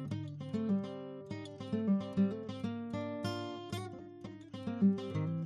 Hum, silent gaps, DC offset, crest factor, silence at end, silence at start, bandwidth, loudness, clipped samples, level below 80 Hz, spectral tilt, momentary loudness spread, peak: none; none; under 0.1%; 18 dB; 0 s; 0 s; 12 kHz; -37 LUFS; under 0.1%; -72 dBFS; -8 dB/octave; 14 LU; -20 dBFS